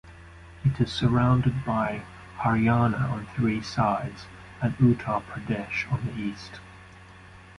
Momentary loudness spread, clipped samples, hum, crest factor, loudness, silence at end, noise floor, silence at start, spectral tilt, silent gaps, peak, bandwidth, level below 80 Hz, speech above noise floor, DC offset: 15 LU; under 0.1%; none; 18 dB; -26 LUFS; 0.05 s; -48 dBFS; 0.05 s; -7.5 dB/octave; none; -8 dBFS; 11 kHz; -48 dBFS; 23 dB; under 0.1%